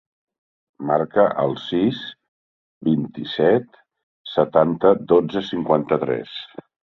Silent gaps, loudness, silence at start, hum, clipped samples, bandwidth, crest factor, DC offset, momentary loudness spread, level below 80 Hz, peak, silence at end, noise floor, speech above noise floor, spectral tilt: 2.28-2.81 s, 4.03-4.24 s; -20 LUFS; 0.8 s; none; under 0.1%; 6.2 kHz; 20 dB; under 0.1%; 15 LU; -60 dBFS; -2 dBFS; 0.4 s; under -90 dBFS; over 71 dB; -8 dB/octave